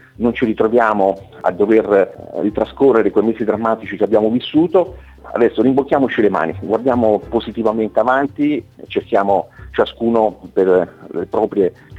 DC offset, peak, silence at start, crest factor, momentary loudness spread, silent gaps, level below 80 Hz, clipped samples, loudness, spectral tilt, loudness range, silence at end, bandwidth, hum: under 0.1%; 0 dBFS; 0.2 s; 14 dB; 8 LU; none; -46 dBFS; under 0.1%; -16 LUFS; -8 dB/octave; 2 LU; 0 s; 7.8 kHz; none